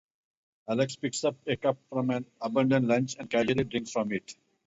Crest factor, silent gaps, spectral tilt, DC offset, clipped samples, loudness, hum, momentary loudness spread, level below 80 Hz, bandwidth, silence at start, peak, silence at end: 18 dB; none; -5.5 dB/octave; under 0.1%; under 0.1%; -29 LUFS; none; 8 LU; -62 dBFS; 8 kHz; 0.65 s; -12 dBFS; 0.35 s